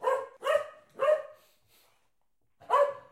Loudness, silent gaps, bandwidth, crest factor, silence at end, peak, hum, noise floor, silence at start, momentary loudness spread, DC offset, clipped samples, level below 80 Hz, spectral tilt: -29 LUFS; none; 15 kHz; 18 dB; 0.1 s; -14 dBFS; none; -81 dBFS; 0 s; 10 LU; under 0.1%; under 0.1%; -80 dBFS; -2 dB/octave